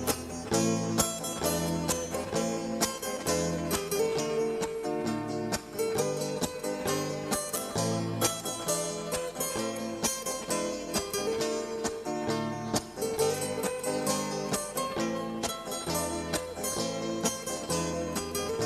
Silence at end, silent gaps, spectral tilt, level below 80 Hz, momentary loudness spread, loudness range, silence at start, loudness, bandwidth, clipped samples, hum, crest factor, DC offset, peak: 0 s; none; -3.5 dB/octave; -56 dBFS; 4 LU; 2 LU; 0 s; -31 LUFS; 16 kHz; under 0.1%; none; 22 dB; under 0.1%; -10 dBFS